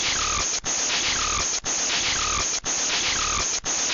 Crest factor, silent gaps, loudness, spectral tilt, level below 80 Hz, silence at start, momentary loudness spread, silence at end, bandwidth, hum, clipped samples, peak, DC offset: 10 dB; none; -22 LUFS; 0 dB/octave; -42 dBFS; 0 s; 2 LU; 0 s; 7.8 kHz; none; under 0.1%; -14 dBFS; under 0.1%